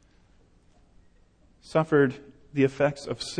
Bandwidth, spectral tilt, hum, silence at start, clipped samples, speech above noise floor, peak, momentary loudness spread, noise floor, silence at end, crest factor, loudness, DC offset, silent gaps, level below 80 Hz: 10 kHz; -6 dB/octave; none; 1.7 s; under 0.1%; 35 dB; -10 dBFS; 12 LU; -60 dBFS; 0 s; 18 dB; -26 LUFS; under 0.1%; none; -58 dBFS